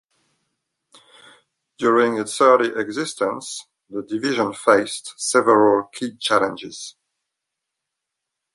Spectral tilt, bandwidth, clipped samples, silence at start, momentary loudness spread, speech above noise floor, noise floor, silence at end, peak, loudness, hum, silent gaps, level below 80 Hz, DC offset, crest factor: -3.5 dB/octave; 11.5 kHz; under 0.1%; 1.8 s; 17 LU; 62 dB; -82 dBFS; 1.65 s; -2 dBFS; -19 LUFS; none; none; -68 dBFS; under 0.1%; 20 dB